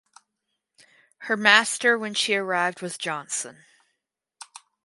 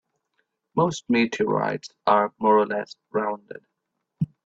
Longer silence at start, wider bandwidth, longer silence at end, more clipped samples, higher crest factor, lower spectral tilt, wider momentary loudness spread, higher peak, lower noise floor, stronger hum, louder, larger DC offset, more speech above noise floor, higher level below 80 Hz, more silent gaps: first, 1.2 s vs 0.75 s; first, 11.5 kHz vs 8 kHz; first, 1.3 s vs 0.2 s; neither; first, 26 dB vs 18 dB; second, -1.5 dB/octave vs -6 dB/octave; first, 24 LU vs 11 LU; first, 0 dBFS vs -6 dBFS; about the same, -80 dBFS vs -79 dBFS; neither; about the same, -22 LUFS vs -24 LUFS; neither; about the same, 57 dB vs 56 dB; second, -82 dBFS vs -66 dBFS; neither